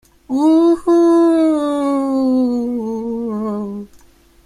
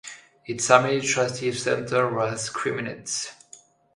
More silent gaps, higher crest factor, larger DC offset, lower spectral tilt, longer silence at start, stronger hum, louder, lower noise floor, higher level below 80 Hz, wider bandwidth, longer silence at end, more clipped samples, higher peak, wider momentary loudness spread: neither; second, 10 dB vs 24 dB; neither; first, -7 dB/octave vs -3.5 dB/octave; first, 0.3 s vs 0.05 s; neither; first, -16 LUFS vs -24 LUFS; second, -48 dBFS vs -52 dBFS; first, -52 dBFS vs -64 dBFS; about the same, 11 kHz vs 11.5 kHz; first, 0.6 s vs 0.4 s; neither; second, -4 dBFS vs 0 dBFS; second, 11 LU vs 16 LU